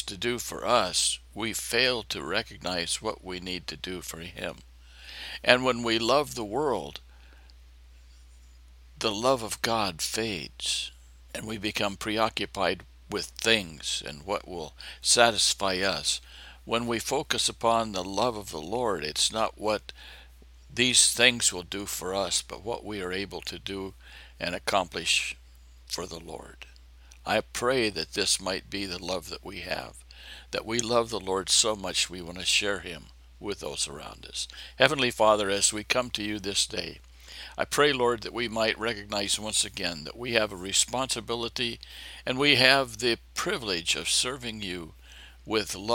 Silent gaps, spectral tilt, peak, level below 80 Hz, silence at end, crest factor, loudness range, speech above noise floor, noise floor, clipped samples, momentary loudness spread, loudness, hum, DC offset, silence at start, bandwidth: none; -2 dB/octave; 0 dBFS; -52 dBFS; 0 s; 28 dB; 6 LU; 23 dB; -52 dBFS; under 0.1%; 16 LU; -27 LUFS; none; under 0.1%; 0 s; 17 kHz